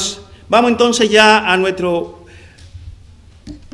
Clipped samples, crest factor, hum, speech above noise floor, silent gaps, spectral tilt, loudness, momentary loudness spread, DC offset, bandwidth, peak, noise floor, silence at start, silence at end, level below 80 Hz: 0.2%; 16 dB; none; 29 dB; none; -3 dB/octave; -12 LUFS; 13 LU; under 0.1%; 12 kHz; 0 dBFS; -42 dBFS; 0 s; 0.15 s; -44 dBFS